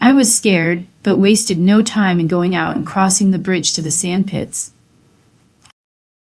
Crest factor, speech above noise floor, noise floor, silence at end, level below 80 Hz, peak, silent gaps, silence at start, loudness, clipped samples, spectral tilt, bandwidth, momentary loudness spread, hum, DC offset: 16 dB; 39 dB; -54 dBFS; 1.6 s; -54 dBFS; 0 dBFS; none; 0 s; -15 LUFS; under 0.1%; -4 dB/octave; 12 kHz; 8 LU; none; under 0.1%